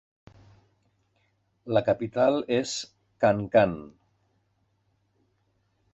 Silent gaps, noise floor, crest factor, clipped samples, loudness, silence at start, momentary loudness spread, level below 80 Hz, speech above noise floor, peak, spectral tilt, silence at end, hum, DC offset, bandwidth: none; -71 dBFS; 22 dB; under 0.1%; -25 LUFS; 1.65 s; 11 LU; -60 dBFS; 47 dB; -8 dBFS; -5.5 dB/octave; 2.05 s; none; under 0.1%; 8.2 kHz